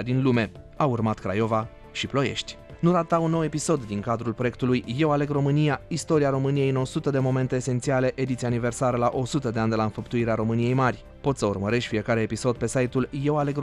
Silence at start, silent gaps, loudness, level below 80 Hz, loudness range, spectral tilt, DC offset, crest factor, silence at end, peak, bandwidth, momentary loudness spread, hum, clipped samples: 0 s; none; -25 LUFS; -50 dBFS; 1 LU; -6.5 dB/octave; under 0.1%; 16 dB; 0 s; -8 dBFS; 12 kHz; 5 LU; none; under 0.1%